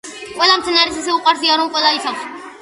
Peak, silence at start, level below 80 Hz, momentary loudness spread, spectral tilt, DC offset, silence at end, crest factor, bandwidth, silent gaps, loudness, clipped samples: 0 dBFS; 0.05 s; -54 dBFS; 14 LU; -0.5 dB/octave; under 0.1%; 0 s; 16 dB; 11.5 kHz; none; -14 LUFS; under 0.1%